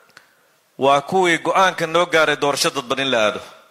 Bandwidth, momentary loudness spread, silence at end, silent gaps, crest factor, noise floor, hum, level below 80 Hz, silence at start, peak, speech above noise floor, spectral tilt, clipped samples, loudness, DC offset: 15.5 kHz; 5 LU; 0.2 s; none; 16 dB; -58 dBFS; none; -62 dBFS; 0.8 s; -2 dBFS; 41 dB; -3 dB/octave; under 0.1%; -17 LUFS; under 0.1%